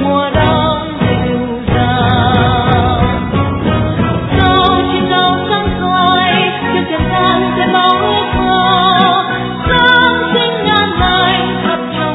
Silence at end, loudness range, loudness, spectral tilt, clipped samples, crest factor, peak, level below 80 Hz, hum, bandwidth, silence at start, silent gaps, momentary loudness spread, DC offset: 0 s; 2 LU; -11 LUFS; -8.5 dB/octave; under 0.1%; 12 dB; 0 dBFS; -28 dBFS; none; 5.4 kHz; 0 s; none; 6 LU; under 0.1%